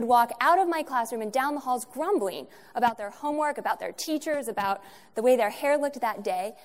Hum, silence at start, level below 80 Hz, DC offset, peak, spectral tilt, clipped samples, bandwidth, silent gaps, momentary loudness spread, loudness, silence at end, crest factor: none; 0 s; -72 dBFS; 0.1%; -8 dBFS; -3.5 dB/octave; under 0.1%; 16 kHz; none; 9 LU; -27 LUFS; 0.1 s; 18 dB